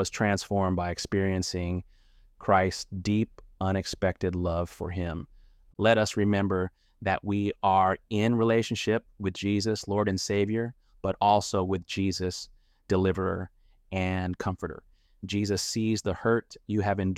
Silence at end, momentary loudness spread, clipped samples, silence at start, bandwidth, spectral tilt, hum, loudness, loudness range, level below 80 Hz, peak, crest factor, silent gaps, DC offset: 0 s; 11 LU; under 0.1%; 0 s; 14.5 kHz; -5.5 dB/octave; none; -28 LUFS; 4 LU; -52 dBFS; -8 dBFS; 20 dB; none; under 0.1%